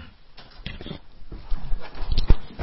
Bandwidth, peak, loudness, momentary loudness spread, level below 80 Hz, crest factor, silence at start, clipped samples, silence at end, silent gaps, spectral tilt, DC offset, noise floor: 5.8 kHz; -2 dBFS; -32 LUFS; 21 LU; -26 dBFS; 20 dB; 0 s; under 0.1%; 0 s; none; -9.5 dB/octave; under 0.1%; -45 dBFS